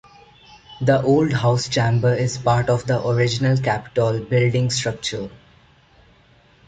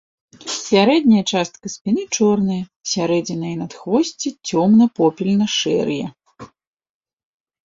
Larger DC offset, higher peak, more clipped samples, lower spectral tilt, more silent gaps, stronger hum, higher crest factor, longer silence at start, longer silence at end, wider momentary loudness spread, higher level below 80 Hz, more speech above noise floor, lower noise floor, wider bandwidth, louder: neither; about the same, -4 dBFS vs -2 dBFS; neither; about the same, -5.5 dB/octave vs -5 dB/octave; second, none vs 1.81-1.85 s, 2.76-2.80 s; neither; about the same, 16 dB vs 18 dB; first, 0.7 s vs 0.4 s; about the same, 1.3 s vs 1.2 s; second, 7 LU vs 13 LU; first, -50 dBFS vs -60 dBFS; first, 35 dB vs 25 dB; first, -54 dBFS vs -42 dBFS; first, 9.2 kHz vs 7.8 kHz; about the same, -20 LUFS vs -18 LUFS